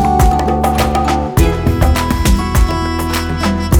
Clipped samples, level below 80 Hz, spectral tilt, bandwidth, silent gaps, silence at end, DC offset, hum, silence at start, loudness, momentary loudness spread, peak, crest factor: under 0.1%; -18 dBFS; -5.5 dB/octave; 19 kHz; none; 0 s; under 0.1%; none; 0 s; -14 LUFS; 4 LU; 0 dBFS; 12 dB